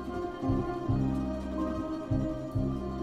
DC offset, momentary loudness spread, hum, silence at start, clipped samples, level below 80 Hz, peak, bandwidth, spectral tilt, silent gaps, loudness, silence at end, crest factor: under 0.1%; 4 LU; none; 0 s; under 0.1%; -42 dBFS; -16 dBFS; 11 kHz; -9 dB/octave; none; -33 LUFS; 0 s; 14 dB